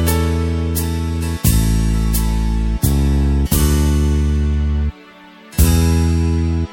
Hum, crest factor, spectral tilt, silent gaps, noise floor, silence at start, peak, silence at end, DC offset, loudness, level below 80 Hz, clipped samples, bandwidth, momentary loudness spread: none; 14 dB; -6 dB/octave; none; -41 dBFS; 0 s; 0 dBFS; 0 s; under 0.1%; -17 LUFS; -18 dBFS; under 0.1%; 17 kHz; 5 LU